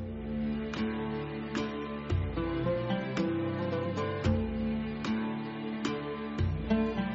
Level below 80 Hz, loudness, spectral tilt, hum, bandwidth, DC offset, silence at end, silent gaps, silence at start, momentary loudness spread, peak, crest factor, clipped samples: -46 dBFS; -33 LUFS; -6 dB/octave; none; 7.6 kHz; under 0.1%; 0 s; none; 0 s; 6 LU; -16 dBFS; 16 dB; under 0.1%